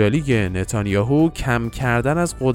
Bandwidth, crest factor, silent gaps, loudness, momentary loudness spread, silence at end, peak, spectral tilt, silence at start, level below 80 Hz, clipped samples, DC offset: 16.5 kHz; 16 dB; none; -20 LUFS; 4 LU; 0 s; -4 dBFS; -6.5 dB/octave; 0 s; -36 dBFS; under 0.1%; under 0.1%